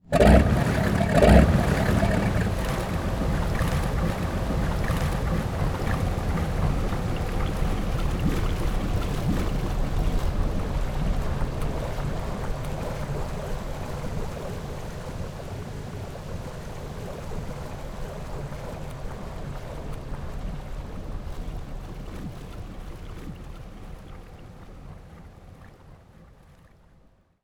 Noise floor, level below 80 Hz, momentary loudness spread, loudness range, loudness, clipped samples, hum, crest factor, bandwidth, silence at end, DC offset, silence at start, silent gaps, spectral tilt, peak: -58 dBFS; -30 dBFS; 17 LU; 18 LU; -27 LUFS; under 0.1%; none; 24 dB; 18 kHz; 1.15 s; under 0.1%; 0.05 s; none; -7 dB/octave; -2 dBFS